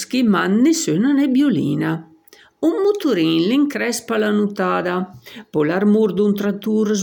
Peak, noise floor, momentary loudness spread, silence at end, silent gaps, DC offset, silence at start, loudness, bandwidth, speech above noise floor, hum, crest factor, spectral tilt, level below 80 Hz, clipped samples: -6 dBFS; -49 dBFS; 7 LU; 0 s; none; under 0.1%; 0 s; -18 LUFS; 17.5 kHz; 32 dB; none; 12 dB; -5.5 dB/octave; -66 dBFS; under 0.1%